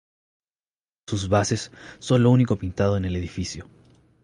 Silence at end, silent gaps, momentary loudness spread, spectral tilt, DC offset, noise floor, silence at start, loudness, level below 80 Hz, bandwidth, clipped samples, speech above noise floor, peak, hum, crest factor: 0.6 s; none; 16 LU; -6.5 dB/octave; under 0.1%; under -90 dBFS; 1.1 s; -23 LUFS; -42 dBFS; 10.5 kHz; under 0.1%; over 68 dB; -6 dBFS; none; 18 dB